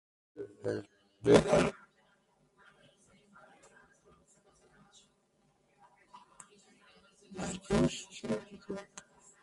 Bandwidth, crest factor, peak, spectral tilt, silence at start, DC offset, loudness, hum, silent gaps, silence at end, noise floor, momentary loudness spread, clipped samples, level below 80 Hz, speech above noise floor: 11.5 kHz; 26 dB; -10 dBFS; -5.5 dB/octave; 0.35 s; under 0.1%; -32 LUFS; none; none; 0.4 s; -73 dBFS; 30 LU; under 0.1%; -58 dBFS; 45 dB